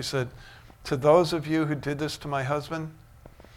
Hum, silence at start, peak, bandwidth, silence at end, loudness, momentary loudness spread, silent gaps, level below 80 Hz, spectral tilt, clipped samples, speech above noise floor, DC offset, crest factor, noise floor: none; 0 s; -8 dBFS; 16.5 kHz; 0.15 s; -26 LUFS; 15 LU; none; -54 dBFS; -6 dB/octave; under 0.1%; 24 dB; under 0.1%; 20 dB; -50 dBFS